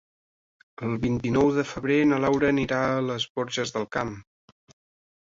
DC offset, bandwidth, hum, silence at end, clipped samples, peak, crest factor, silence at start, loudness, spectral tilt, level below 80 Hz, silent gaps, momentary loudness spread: under 0.1%; 7.8 kHz; none; 1 s; under 0.1%; -10 dBFS; 16 dB; 0.8 s; -25 LUFS; -6 dB/octave; -54 dBFS; 3.30-3.35 s; 9 LU